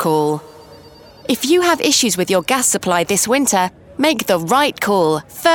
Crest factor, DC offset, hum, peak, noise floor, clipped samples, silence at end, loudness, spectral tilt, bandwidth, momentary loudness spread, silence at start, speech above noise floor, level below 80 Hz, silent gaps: 16 dB; under 0.1%; none; 0 dBFS; -41 dBFS; under 0.1%; 0 s; -16 LUFS; -3 dB/octave; 19.5 kHz; 7 LU; 0 s; 26 dB; -54 dBFS; none